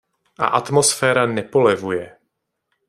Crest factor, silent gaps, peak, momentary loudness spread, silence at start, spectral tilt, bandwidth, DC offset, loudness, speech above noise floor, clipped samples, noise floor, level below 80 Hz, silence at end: 18 dB; none; -2 dBFS; 9 LU; 0.4 s; -3.5 dB/octave; 15.5 kHz; under 0.1%; -18 LUFS; 57 dB; under 0.1%; -74 dBFS; -62 dBFS; 0.8 s